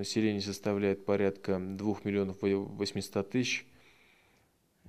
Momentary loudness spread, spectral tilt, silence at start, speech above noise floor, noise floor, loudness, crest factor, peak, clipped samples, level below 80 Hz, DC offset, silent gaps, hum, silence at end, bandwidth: 5 LU; -5.5 dB/octave; 0 s; 38 dB; -70 dBFS; -33 LUFS; 18 dB; -16 dBFS; under 0.1%; -72 dBFS; 0.1%; none; none; 0 s; 14 kHz